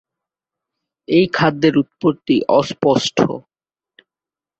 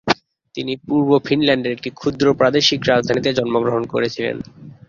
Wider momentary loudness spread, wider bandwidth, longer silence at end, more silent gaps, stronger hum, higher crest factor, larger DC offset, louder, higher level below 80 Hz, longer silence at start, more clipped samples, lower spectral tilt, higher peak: second, 5 LU vs 11 LU; first, 8.2 kHz vs 7.4 kHz; first, 1.2 s vs 0.2 s; neither; neither; about the same, 18 dB vs 16 dB; neither; about the same, -16 LUFS vs -18 LUFS; about the same, -56 dBFS vs -52 dBFS; first, 1.1 s vs 0.05 s; neither; about the same, -5.5 dB/octave vs -5 dB/octave; about the same, -2 dBFS vs -2 dBFS